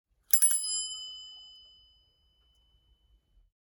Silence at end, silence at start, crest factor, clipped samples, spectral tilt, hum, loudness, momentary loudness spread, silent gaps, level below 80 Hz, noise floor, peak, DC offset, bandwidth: 2.25 s; 0.3 s; 30 dB; under 0.1%; 4 dB/octave; none; -25 LUFS; 24 LU; none; -70 dBFS; -69 dBFS; -4 dBFS; under 0.1%; 19.5 kHz